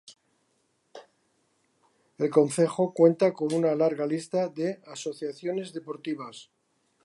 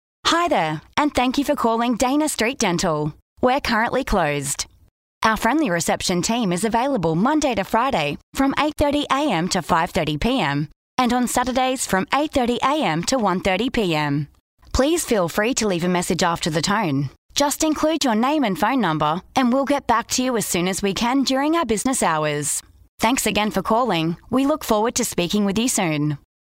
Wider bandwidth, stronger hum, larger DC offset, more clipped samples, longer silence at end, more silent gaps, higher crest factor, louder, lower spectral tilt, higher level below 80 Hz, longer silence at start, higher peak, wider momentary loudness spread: second, 11.5 kHz vs 16 kHz; neither; neither; neither; first, 0.6 s vs 0.4 s; second, none vs 3.22-3.36 s, 4.91-5.21 s, 8.23-8.33 s, 10.76-10.97 s, 14.40-14.58 s, 17.18-17.29 s, 22.89-22.98 s; first, 22 dB vs 16 dB; second, -27 LUFS vs -20 LUFS; first, -6 dB/octave vs -4 dB/octave; second, -82 dBFS vs -42 dBFS; second, 0.1 s vs 0.25 s; about the same, -6 dBFS vs -4 dBFS; first, 15 LU vs 4 LU